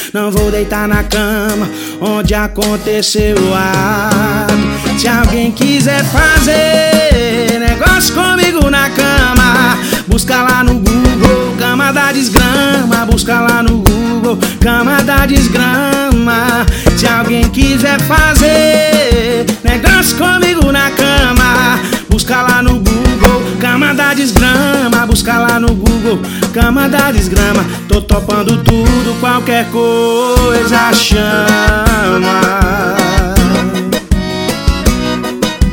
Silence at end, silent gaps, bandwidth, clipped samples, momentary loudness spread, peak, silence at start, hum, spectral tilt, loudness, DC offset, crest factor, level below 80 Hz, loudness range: 0 s; none; over 20 kHz; 2%; 5 LU; 0 dBFS; 0 s; none; -4.5 dB/octave; -10 LUFS; under 0.1%; 10 dB; -18 dBFS; 3 LU